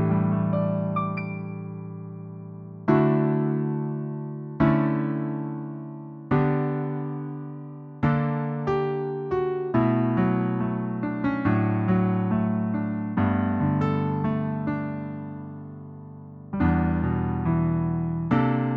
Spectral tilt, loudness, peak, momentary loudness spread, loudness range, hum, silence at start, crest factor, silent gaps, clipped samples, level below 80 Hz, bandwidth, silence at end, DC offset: -11 dB/octave; -25 LUFS; -6 dBFS; 15 LU; 4 LU; none; 0 s; 18 dB; none; under 0.1%; -46 dBFS; 5 kHz; 0 s; under 0.1%